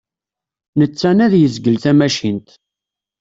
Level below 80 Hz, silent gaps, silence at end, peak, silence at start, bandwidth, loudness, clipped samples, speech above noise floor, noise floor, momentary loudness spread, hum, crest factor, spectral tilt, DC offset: -54 dBFS; none; 0.8 s; -2 dBFS; 0.75 s; 7.8 kHz; -14 LUFS; under 0.1%; 73 dB; -87 dBFS; 10 LU; none; 14 dB; -6.5 dB/octave; under 0.1%